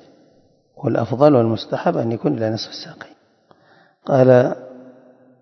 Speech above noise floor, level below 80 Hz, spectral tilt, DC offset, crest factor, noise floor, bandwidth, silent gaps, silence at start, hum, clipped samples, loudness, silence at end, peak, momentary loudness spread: 40 dB; -64 dBFS; -8 dB/octave; under 0.1%; 20 dB; -56 dBFS; 6.4 kHz; none; 0.8 s; none; under 0.1%; -18 LUFS; 0.6 s; 0 dBFS; 20 LU